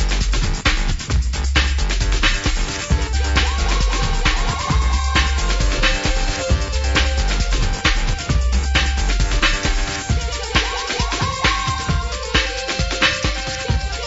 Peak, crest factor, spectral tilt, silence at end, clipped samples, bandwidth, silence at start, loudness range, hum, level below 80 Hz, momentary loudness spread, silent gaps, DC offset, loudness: -2 dBFS; 16 dB; -3.5 dB/octave; 0 s; under 0.1%; 8 kHz; 0 s; 1 LU; none; -20 dBFS; 4 LU; none; under 0.1%; -19 LUFS